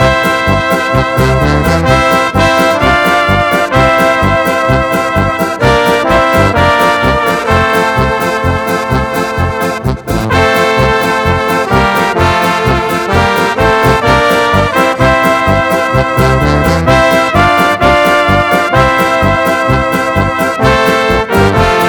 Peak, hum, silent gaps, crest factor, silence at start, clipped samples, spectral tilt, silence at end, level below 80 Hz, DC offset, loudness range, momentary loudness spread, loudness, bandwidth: 0 dBFS; none; none; 10 dB; 0 s; 0.5%; -5.5 dB/octave; 0 s; -24 dBFS; 0.2%; 3 LU; 4 LU; -9 LUFS; 19.5 kHz